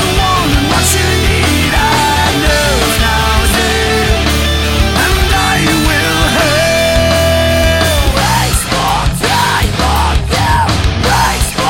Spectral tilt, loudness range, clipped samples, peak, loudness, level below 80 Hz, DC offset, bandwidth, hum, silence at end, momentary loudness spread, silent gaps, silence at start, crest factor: -4 dB/octave; 1 LU; under 0.1%; 0 dBFS; -11 LUFS; -18 dBFS; 1%; 17.5 kHz; none; 0 s; 2 LU; none; 0 s; 10 dB